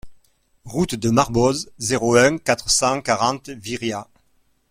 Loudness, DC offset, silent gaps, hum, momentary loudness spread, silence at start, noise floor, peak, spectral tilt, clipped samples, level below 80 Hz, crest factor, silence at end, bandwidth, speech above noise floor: -20 LUFS; under 0.1%; none; none; 13 LU; 0.05 s; -62 dBFS; -2 dBFS; -4 dB/octave; under 0.1%; -46 dBFS; 20 dB; 0.65 s; 16 kHz; 43 dB